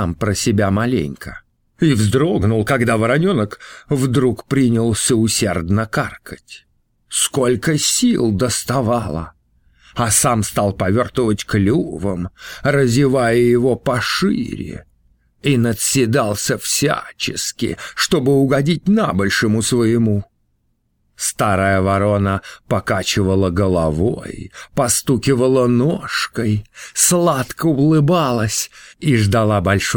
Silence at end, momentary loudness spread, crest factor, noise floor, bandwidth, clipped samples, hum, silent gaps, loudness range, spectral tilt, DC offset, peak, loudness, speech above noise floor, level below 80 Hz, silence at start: 0 s; 9 LU; 16 dB; -65 dBFS; over 20 kHz; under 0.1%; none; none; 2 LU; -4.5 dB/octave; under 0.1%; 0 dBFS; -17 LUFS; 48 dB; -42 dBFS; 0 s